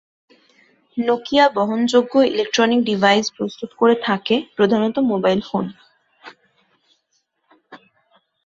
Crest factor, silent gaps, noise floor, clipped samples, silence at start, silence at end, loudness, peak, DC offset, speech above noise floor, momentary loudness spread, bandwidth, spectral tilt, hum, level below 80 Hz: 18 dB; none; -69 dBFS; under 0.1%; 0.95 s; 0.7 s; -18 LUFS; -2 dBFS; under 0.1%; 51 dB; 10 LU; 8 kHz; -5 dB/octave; none; -62 dBFS